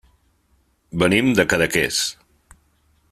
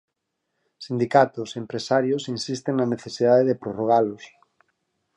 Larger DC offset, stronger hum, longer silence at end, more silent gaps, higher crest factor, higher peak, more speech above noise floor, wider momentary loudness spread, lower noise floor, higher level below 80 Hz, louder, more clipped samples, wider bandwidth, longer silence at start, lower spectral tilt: neither; neither; about the same, 1 s vs 0.9 s; neither; about the same, 20 dB vs 20 dB; about the same, -2 dBFS vs -2 dBFS; second, 44 dB vs 56 dB; second, 8 LU vs 12 LU; second, -63 dBFS vs -79 dBFS; first, -50 dBFS vs -68 dBFS; first, -18 LUFS vs -23 LUFS; neither; first, 15 kHz vs 11 kHz; first, 0.95 s vs 0.8 s; second, -4 dB/octave vs -6 dB/octave